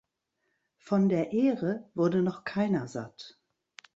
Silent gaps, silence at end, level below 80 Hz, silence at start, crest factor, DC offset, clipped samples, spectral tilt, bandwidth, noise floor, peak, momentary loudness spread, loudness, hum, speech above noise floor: none; 0.65 s; -70 dBFS; 0.85 s; 16 dB; under 0.1%; under 0.1%; -8 dB/octave; 8 kHz; -80 dBFS; -14 dBFS; 15 LU; -29 LUFS; none; 52 dB